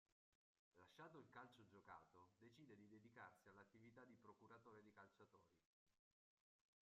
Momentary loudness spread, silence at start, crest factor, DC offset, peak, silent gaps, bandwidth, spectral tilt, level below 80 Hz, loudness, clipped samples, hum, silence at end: 4 LU; 0.1 s; 20 dB; under 0.1%; -50 dBFS; 0.12-0.72 s, 5.66-5.86 s; 7.4 kHz; -4.5 dB/octave; under -90 dBFS; -67 LUFS; under 0.1%; none; 0.9 s